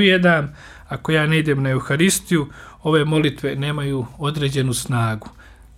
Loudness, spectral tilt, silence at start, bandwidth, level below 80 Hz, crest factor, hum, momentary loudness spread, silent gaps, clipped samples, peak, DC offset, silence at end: -19 LUFS; -5 dB/octave; 0 s; 16 kHz; -46 dBFS; 16 dB; none; 11 LU; none; under 0.1%; -2 dBFS; under 0.1%; 0.25 s